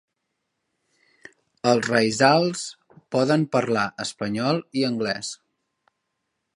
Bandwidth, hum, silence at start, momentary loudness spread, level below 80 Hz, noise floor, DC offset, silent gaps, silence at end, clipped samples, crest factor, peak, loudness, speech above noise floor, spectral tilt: 11.5 kHz; none; 1.65 s; 12 LU; -66 dBFS; -78 dBFS; under 0.1%; none; 1.2 s; under 0.1%; 22 dB; -2 dBFS; -22 LUFS; 56 dB; -4.5 dB/octave